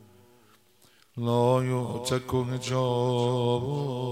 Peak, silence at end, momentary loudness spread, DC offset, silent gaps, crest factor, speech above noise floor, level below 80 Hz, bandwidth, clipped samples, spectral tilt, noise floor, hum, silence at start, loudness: -10 dBFS; 0 s; 7 LU; under 0.1%; none; 18 dB; 35 dB; -62 dBFS; 15 kHz; under 0.1%; -6.5 dB/octave; -61 dBFS; none; 1.15 s; -27 LUFS